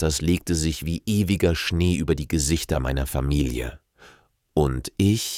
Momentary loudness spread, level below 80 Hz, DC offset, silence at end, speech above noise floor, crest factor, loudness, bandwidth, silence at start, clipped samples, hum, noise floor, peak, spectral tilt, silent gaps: 5 LU; -32 dBFS; under 0.1%; 0 s; 33 dB; 16 dB; -24 LUFS; 17 kHz; 0 s; under 0.1%; none; -55 dBFS; -6 dBFS; -5 dB/octave; none